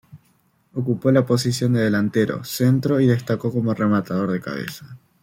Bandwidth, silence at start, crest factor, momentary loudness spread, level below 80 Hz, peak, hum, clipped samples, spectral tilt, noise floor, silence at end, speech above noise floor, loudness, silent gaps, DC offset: 16.5 kHz; 0.15 s; 16 dB; 11 LU; -58 dBFS; -4 dBFS; none; under 0.1%; -6.5 dB/octave; -62 dBFS; 0.25 s; 42 dB; -20 LUFS; none; under 0.1%